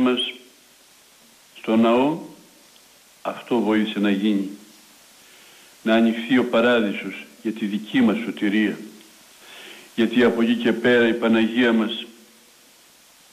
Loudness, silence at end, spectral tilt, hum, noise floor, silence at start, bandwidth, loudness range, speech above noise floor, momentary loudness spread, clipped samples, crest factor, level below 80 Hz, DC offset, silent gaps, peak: -21 LUFS; 1.2 s; -5.5 dB/octave; none; -53 dBFS; 0 s; 15 kHz; 5 LU; 33 dB; 17 LU; under 0.1%; 14 dB; -66 dBFS; under 0.1%; none; -8 dBFS